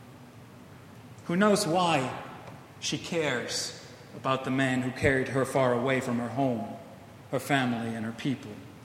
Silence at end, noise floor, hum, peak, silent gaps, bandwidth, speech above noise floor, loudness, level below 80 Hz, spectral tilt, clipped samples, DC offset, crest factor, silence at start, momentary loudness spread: 0 s; -49 dBFS; none; -10 dBFS; none; 16 kHz; 21 dB; -28 LUFS; -60 dBFS; -5 dB/octave; under 0.1%; under 0.1%; 20 dB; 0 s; 22 LU